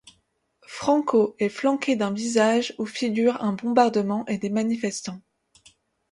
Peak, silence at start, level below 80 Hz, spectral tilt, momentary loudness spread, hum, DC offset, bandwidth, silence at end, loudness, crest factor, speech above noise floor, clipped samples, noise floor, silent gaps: -4 dBFS; 0.7 s; -68 dBFS; -5 dB/octave; 9 LU; none; under 0.1%; 11.5 kHz; 0.95 s; -23 LUFS; 20 dB; 46 dB; under 0.1%; -69 dBFS; none